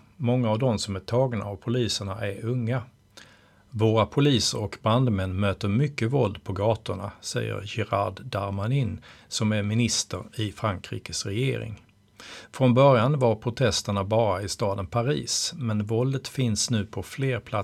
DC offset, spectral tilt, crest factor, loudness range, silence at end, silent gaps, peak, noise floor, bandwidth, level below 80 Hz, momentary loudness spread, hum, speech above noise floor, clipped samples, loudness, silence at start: under 0.1%; -5 dB/octave; 20 dB; 5 LU; 0 s; none; -6 dBFS; -55 dBFS; 14 kHz; -54 dBFS; 10 LU; none; 30 dB; under 0.1%; -26 LUFS; 0.2 s